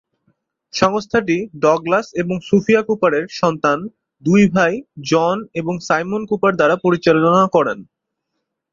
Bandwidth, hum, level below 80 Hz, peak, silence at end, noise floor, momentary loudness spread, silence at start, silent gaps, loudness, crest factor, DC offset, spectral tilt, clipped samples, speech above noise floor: 7.6 kHz; none; -56 dBFS; -2 dBFS; 0.9 s; -76 dBFS; 10 LU; 0.75 s; none; -17 LUFS; 16 dB; under 0.1%; -6 dB/octave; under 0.1%; 60 dB